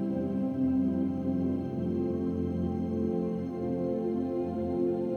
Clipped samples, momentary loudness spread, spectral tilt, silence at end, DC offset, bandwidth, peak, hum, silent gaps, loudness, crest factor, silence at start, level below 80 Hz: under 0.1%; 4 LU; -10.5 dB/octave; 0 s; under 0.1%; 6.6 kHz; -18 dBFS; none; none; -31 LUFS; 12 dB; 0 s; -60 dBFS